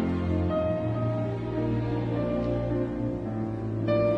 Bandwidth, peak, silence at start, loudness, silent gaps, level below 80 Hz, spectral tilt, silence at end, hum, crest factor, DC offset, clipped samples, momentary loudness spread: 6 kHz; -14 dBFS; 0 s; -29 LUFS; none; -44 dBFS; -10 dB/octave; 0 s; none; 14 dB; under 0.1%; under 0.1%; 4 LU